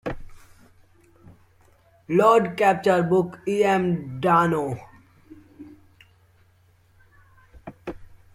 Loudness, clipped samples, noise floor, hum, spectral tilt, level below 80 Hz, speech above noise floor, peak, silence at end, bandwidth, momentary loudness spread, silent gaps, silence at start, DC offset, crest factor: -21 LUFS; under 0.1%; -59 dBFS; none; -7 dB/octave; -52 dBFS; 39 dB; -4 dBFS; 0.3 s; 15 kHz; 21 LU; none; 0.05 s; under 0.1%; 20 dB